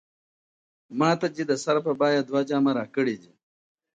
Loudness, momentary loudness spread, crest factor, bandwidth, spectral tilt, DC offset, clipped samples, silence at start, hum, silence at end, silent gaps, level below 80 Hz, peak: -25 LUFS; 5 LU; 18 dB; 9.2 kHz; -5.5 dB/octave; under 0.1%; under 0.1%; 0.9 s; none; 0.75 s; none; -76 dBFS; -8 dBFS